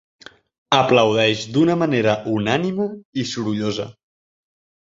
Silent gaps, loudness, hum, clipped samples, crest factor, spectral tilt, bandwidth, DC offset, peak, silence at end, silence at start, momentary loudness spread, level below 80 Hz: 3.05-3.13 s; -19 LUFS; none; under 0.1%; 20 dB; -5.5 dB/octave; 7.8 kHz; under 0.1%; 0 dBFS; 0.95 s; 0.7 s; 10 LU; -58 dBFS